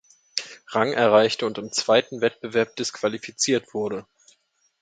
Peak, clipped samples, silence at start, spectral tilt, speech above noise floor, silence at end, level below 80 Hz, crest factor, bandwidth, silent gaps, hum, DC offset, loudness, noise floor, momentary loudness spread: -2 dBFS; under 0.1%; 0.35 s; -3 dB/octave; 43 dB; 0.8 s; -68 dBFS; 22 dB; 9.4 kHz; none; none; under 0.1%; -23 LUFS; -65 dBFS; 13 LU